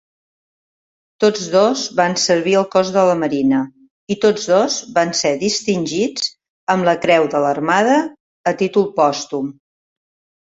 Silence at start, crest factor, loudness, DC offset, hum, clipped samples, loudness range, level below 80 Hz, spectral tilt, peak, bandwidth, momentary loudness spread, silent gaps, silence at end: 1.2 s; 16 dB; -17 LUFS; under 0.1%; none; under 0.1%; 2 LU; -60 dBFS; -4 dB/octave; 0 dBFS; 8 kHz; 9 LU; 3.90-4.07 s, 6.49-6.67 s, 8.20-8.44 s; 1 s